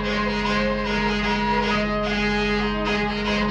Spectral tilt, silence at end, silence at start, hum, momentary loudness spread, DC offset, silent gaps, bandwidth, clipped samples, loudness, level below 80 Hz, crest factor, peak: -5.5 dB/octave; 0 s; 0 s; none; 2 LU; under 0.1%; none; 9 kHz; under 0.1%; -22 LUFS; -34 dBFS; 12 dB; -10 dBFS